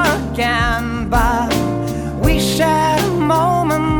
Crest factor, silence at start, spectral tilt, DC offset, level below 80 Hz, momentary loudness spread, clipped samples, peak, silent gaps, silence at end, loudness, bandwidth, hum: 12 dB; 0 s; -5 dB/octave; under 0.1%; -26 dBFS; 5 LU; under 0.1%; -2 dBFS; none; 0 s; -16 LUFS; over 20 kHz; none